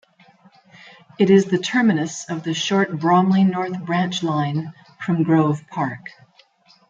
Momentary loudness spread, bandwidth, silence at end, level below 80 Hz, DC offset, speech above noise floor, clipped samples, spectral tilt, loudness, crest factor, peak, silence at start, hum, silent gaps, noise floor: 12 LU; 7.6 kHz; 0.8 s; -66 dBFS; under 0.1%; 36 dB; under 0.1%; -6 dB/octave; -20 LUFS; 18 dB; -2 dBFS; 1.2 s; none; none; -55 dBFS